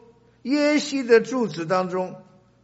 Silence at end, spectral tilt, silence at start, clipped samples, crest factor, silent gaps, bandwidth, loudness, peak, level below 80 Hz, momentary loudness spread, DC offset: 0.45 s; -4 dB/octave; 0.45 s; under 0.1%; 18 dB; none; 8 kHz; -22 LUFS; -4 dBFS; -70 dBFS; 11 LU; under 0.1%